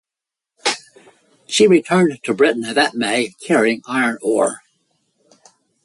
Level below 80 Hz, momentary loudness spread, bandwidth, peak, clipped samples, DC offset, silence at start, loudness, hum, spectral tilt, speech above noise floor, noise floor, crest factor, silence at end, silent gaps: -64 dBFS; 9 LU; 11.5 kHz; -2 dBFS; under 0.1%; under 0.1%; 0.65 s; -17 LUFS; none; -4 dB/octave; 70 dB; -87 dBFS; 16 dB; 1.25 s; none